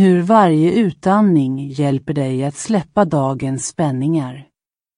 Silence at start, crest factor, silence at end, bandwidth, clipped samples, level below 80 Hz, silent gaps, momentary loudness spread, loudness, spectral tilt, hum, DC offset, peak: 0 s; 14 dB; 0.55 s; 11 kHz; under 0.1%; -54 dBFS; none; 9 LU; -16 LUFS; -7 dB/octave; none; under 0.1%; 0 dBFS